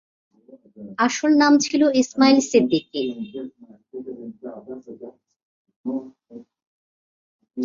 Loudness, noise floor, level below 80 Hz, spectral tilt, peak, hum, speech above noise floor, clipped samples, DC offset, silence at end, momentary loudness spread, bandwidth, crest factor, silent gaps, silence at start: -19 LUFS; -48 dBFS; -66 dBFS; -3.5 dB/octave; -2 dBFS; none; 27 dB; under 0.1%; under 0.1%; 0 s; 23 LU; 7.6 kHz; 20 dB; 5.43-5.65 s, 5.76-5.84 s, 6.67-7.39 s; 0.8 s